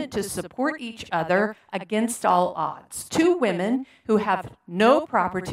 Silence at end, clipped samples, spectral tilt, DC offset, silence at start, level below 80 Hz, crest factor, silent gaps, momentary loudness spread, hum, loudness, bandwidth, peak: 0 s; under 0.1%; -5 dB/octave; under 0.1%; 0 s; -60 dBFS; 18 dB; none; 10 LU; none; -23 LUFS; 16 kHz; -4 dBFS